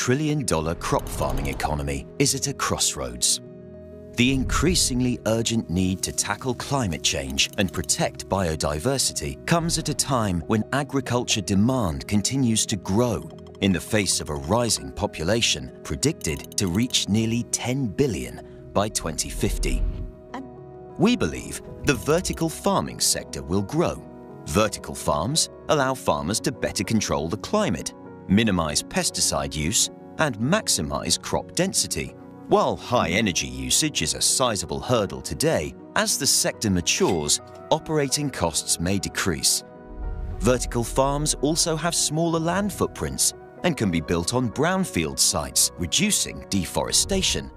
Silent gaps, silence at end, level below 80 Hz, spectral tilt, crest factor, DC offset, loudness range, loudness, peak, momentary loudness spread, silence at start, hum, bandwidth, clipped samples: none; 0 s; -38 dBFS; -3.5 dB/octave; 18 dB; under 0.1%; 3 LU; -23 LUFS; -6 dBFS; 7 LU; 0 s; none; 15.5 kHz; under 0.1%